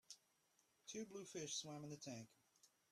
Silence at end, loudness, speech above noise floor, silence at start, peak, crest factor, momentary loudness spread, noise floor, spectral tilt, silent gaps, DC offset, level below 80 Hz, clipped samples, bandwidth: 0.25 s; -52 LUFS; 29 dB; 0.1 s; -36 dBFS; 18 dB; 15 LU; -81 dBFS; -3 dB/octave; none; under 0.1%; under -90 dBFS; under 0.1%; 14 kHz